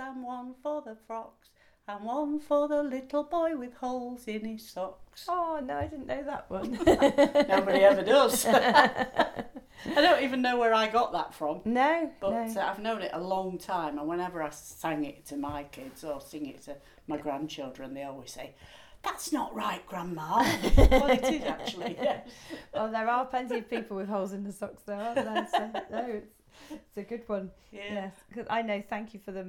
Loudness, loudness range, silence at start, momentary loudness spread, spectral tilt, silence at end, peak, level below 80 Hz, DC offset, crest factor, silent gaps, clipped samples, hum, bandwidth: -29 LUFS; 13 LU; 0 s; 18 LU; -4.5 dB/octave; 0 s; -6 dBFS; -40 dBFS; under 0.1%; 24 dB; none; under 0.1%; none; 19.5 kHz